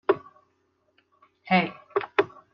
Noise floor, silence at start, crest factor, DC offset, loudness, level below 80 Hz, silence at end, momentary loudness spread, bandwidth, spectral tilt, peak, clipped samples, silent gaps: -70 dBFS; 0.1 s; 22 dB; under 0.1%; -26 LUFS; -76 dBFS; 0.25 s; 5 LU; 5.8 kHz; -4 dB/octave; -6 dBFS; under 0.1%; none